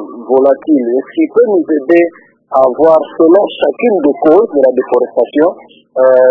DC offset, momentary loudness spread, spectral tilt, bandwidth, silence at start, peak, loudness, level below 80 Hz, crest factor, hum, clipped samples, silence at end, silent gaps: under 0.1%; 5 LU; -8 dB/octave; 4.2 kHz; 0 s; 0 dBFS; -10 LUFS; -56 dBFS; 10 dB; none; 0.3%; 0 s; none